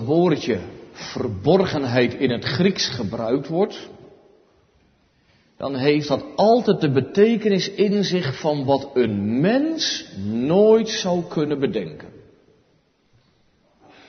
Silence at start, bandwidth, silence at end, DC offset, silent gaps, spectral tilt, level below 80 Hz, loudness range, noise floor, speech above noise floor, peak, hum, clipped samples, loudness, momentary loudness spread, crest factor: 0 s; 6.6 kHz; 1.9 s; under 0.1%; none; -6 dB/octave; -58 dBFS; 6 LU; -62 dBFS; 42 dB; -4 dBFS; none; under 0.1%; -20 LUFS; 11 LU; 18 dB